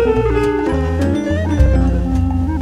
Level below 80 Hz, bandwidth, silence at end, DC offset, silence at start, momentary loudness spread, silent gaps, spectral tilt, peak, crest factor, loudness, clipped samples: -20 dBFS; 10 kHz; 0 s; under 0.1%; 0 s; 4 LU; none; -8 dB/octave; 0 dBFS; 14 dB; -16 LUFS; under 0.1%